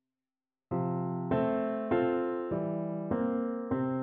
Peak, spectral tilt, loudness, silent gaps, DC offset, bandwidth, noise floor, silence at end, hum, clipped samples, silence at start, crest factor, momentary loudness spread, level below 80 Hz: -16 dBFS; -8 dB/octave; -32 LUFS; none; under 0.1%; 4 kHz; under -90 dBFS; 0 s; none; under 0.1%; 0.7 s; 16 dB; 5 LU; -62 dBFS